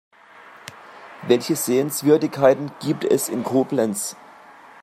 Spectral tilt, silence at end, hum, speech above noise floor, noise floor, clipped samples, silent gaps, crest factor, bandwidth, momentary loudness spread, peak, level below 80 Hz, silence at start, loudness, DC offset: -5 dB/octave; 0.7 s; none; 26 dB; -46 dBFS; under 0.1%; none; 20 dB; 16 kHz; 22 LU; -2 dBFS; -68 dBFS; 0.45 s; -20 LUFS; under 0.1%